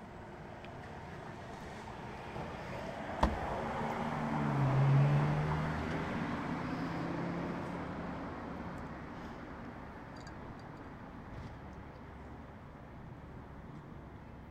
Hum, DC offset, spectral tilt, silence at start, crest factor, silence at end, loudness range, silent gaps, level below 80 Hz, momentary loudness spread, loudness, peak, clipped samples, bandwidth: none; under 0.1%; -7.5 dB/octave; 0 s; 26 dB; 0 s; 16 LU; none; -52 dBFS; 18 LU; -38 LUFS; -12 dBFS; under 0.1%; 9 kHz